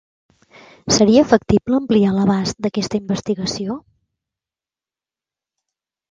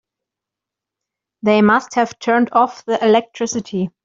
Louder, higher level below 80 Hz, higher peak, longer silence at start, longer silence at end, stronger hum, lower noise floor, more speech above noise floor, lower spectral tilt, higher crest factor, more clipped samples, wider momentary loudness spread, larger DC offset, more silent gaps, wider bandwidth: about the same, -17 LUFS vs -16 LUFS; first, -46 dBFS vs -62 dBFS; about the same, 0 dBFS vs -2 dBFS; second, 0.85 s vs 1.45 s; first, 2.3 s vs 0.15 s; neither; first, under -90 dBFS vs -85 dBFS; first, over 74 dB vs 69 dB; about the same, -5 dB/octave vs -5 dB/octave; about the same, 20 dB vs 16 dB; neither; first, 13 LU vs 9 LU; neither; neither; first, 9.4 kHz vs 7.8 kHz